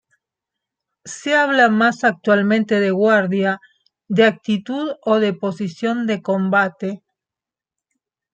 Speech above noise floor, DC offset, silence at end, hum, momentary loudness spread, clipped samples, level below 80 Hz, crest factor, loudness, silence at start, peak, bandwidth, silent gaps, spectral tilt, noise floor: 71 dB; under 0.1%; 1.4 s; none; 11 LU; under 0.1%; -68 dBFS; 18 dB; -18 LUFS; 1.05 s; -2 dBFS; 8.8 kHz; none; -5.5 dB/octave; -88 dBFS